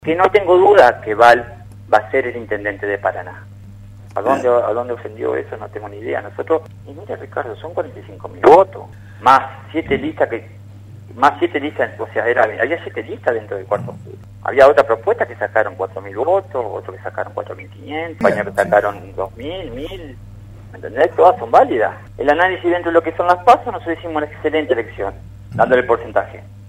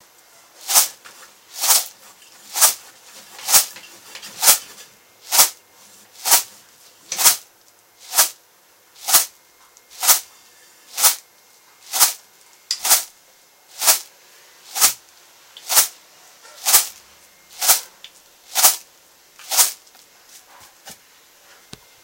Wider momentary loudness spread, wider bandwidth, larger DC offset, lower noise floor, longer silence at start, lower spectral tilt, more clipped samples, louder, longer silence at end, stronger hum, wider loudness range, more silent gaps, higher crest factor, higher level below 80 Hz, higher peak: about the same, 19 LU vs 19 LU; second, 15 kHz vs 17 kHz; neither; second, -37 dBFS vs -54 dBFS; second, 0.05 s vs 0.65 s; first, -6 dB/octave vs 3 dB/octave; neither; about the same, -16 LUFS vs -16 LUFS; second, 0 s vs 1.1 s; neither; first, 6 LU vs 2 LU; neither; second, 16 dB vs 22 dB; first, -46 dBFS vs -66 dBFS; about the same, 0 dBFS vs 0 dBFS